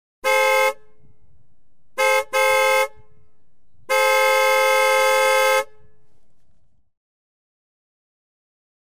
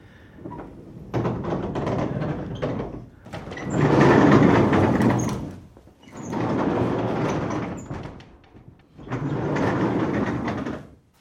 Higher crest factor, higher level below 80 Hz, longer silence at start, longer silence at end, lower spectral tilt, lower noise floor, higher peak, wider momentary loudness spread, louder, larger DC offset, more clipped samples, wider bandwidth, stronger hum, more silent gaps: about the same, 16 dB vs 20 dB; second, -64 dBFS vs -46 dBFS; first, 0.25 s vs 0.05 s; first, 2.05 s vs 0.35 s; second, 1 dB/octave vs -7.5 dB/octave; first, -65 dBFS vs -49 dBFS; second, -6 dBFS vs -2 dBFS; second, 7 LU vs 22 LU; first, -17 LUFS vs -23 LUFS; first, 0.9% vs under 0.1%; neither; first, 16 kHz vs 12.5 kHz; neither; neither